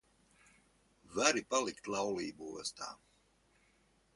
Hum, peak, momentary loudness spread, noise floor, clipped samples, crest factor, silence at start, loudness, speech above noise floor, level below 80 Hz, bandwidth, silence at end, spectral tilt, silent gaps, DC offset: none; -10 dBFS; 15 LU; -72 dBFS; under 0.1%; 30 dB; 1.1 s; -36 LUFS; 35 dB; -74 dBFS; 11.5 kHz; 1.2 s; -2 dB/octave; none; under 0.1%